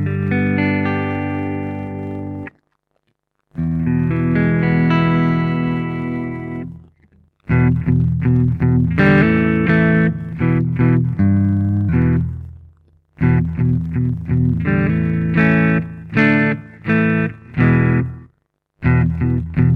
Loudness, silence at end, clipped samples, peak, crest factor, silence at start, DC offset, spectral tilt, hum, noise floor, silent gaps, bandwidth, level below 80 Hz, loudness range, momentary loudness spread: -17 LUFS; 0 s; under 0.1%; -2 dBFS; 14 dB; 0 s; under 0.1%; -10 dB/octave; none; -70 dBFS; none; 4.8 kHz; -34 dBFS; 6 LU; 12 LU